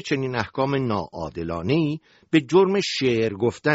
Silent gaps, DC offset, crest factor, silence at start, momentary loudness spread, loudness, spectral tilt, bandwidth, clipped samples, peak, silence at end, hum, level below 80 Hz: none; under 0.1%; 16 dB; 0.05 s; 11 LU; -23 LUFS; -5 dB/octave; 8 kHz; under 0.1%; -6 dBFS; 0 s; none; -52 dBFS